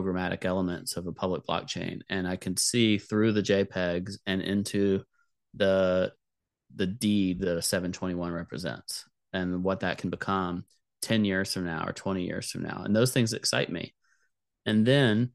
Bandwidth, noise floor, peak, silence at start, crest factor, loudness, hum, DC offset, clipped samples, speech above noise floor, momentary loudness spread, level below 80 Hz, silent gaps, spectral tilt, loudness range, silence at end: 12.5 kHz; -86 dBFS; -10 dBFS; 0 s; 20 dB; -29 LUFS; none; under 0.1%; under 0.1%; 58 dB; 10 LU; -60 dBFS; none; -5 dB/octave; 4 LU; 0.05 s